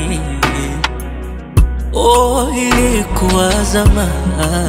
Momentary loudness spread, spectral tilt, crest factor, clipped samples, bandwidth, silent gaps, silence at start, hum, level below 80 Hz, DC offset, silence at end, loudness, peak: 8 LU; -5 dB/octave; 14 dB; under 0.1%; 16.5 kHz; none; 0 s; none; -18 dBFS; under 0.1%; 0 s; -14 LUFS; 0 dBFS